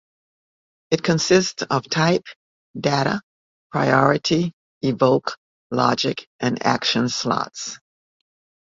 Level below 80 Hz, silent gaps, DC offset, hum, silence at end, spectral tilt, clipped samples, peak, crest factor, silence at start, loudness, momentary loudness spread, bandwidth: -58 dBFS; 2.36-2.74 s, 3.23-3.70 s, 4.53-4.81 s, 5.37-5.70 s, 6.27-6.39 s; under 0.1%; none; 0.95 s; -4.5 dB/octave; under 0.1%; 0 dBFS; 22 dB; 0.9 s; -21 LUFS; 12 LU; 7.8 kHz